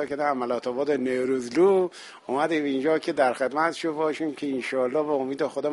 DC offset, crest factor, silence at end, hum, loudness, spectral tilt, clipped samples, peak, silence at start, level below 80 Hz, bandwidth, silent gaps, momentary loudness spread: under 0.1%; 16 dB; 0 s; none; -25 LUFS; -5.5 dB/octave; under 0.1%; -8 dBFS; 0 s; -72 dBFS; 11.5 kHz; none; 7 LU